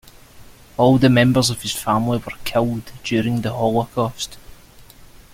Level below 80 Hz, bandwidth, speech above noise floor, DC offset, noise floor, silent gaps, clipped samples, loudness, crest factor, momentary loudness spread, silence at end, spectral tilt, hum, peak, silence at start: -44 dBFS; 16.5 kHz; 26 dB; under 0.1%; -44 dBFS; none; under 0.1%; -19 LUFS; 18 dB; 11 LU; 0.15 s; -5.5 dB/octave; none; -2 dBFS; 0.35 s